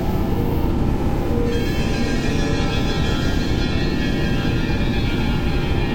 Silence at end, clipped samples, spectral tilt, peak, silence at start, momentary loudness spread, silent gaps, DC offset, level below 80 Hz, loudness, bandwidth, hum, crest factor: 0 s; under 0.1%; -6.5 dB/octave; -6 dBFS; 0 s; 1 LU; none; under 0.1%; -24 dBFS; -21 LUFS; 16.5 kHz; none; 12 dB